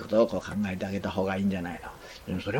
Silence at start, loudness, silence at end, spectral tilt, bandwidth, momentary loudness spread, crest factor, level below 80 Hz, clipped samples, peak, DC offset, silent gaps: 0 s; -30 LUFS; 0 s; -7 dB/octave; 17 kHz; 15 LU; 20 dB; -54 dBFS; under 0.1%; -10 dBFS; under 0.1%; none